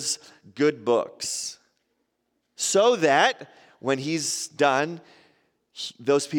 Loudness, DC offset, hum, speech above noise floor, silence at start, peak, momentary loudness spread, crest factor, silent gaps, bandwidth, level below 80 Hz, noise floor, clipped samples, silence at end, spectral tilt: -24 LUFS; under 0.1%; none; 52 dB; 0 s; -6 dBFS; 15 LU; 20 dB; none; 17 kHz; -76 dBFS; -75 dBFS; under 0.1%; 0 s; -3 dB/octave